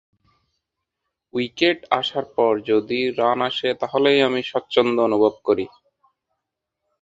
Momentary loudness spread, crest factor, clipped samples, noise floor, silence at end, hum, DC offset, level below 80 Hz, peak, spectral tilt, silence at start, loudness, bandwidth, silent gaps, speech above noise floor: 7 LU; 22 dB; under 0.1%; -81 dBFS; 1.35 s; none; under 0.1%; -64 dBFS; 0 dBFS; -5.5 dB/octave; 1.35 s; -20 LUFS; 7.8 kHz; none; 61 dB